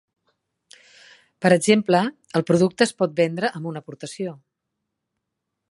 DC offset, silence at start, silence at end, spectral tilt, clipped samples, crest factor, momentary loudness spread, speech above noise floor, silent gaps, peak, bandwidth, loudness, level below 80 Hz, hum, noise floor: under 0.1%; 1.4 s; 1.35 s; -5.5 dB/octave; under 0.1%; 22 dB; 15 LU; 60 dB; none; -2 dBFS; 11.5 kHz; -21 LUFS; -68 dBFS; none; -81 dBFS